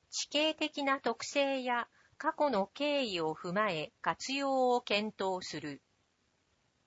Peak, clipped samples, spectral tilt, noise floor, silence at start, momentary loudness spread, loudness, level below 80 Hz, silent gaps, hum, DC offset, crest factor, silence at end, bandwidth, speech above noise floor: -16 dBFS; under 0.1%; -3 dB/octave; -76 dBFS; 0.1 s; 7 LU; -33 LUFS; -78 dBFS; none; none; under 0.1%; 18 dB; 1.1 s; 8 kHz; 42 dB